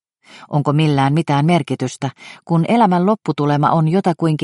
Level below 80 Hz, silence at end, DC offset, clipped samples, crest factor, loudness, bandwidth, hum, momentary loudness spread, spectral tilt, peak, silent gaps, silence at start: -58 dBFS; 0 s; under 0.1%; under 0.1%; 14 dB; -16 LUFS; 11.5 kHz; none; 9 LU; -7.5 dB/octave; -2 dBFS; none; 0.35 s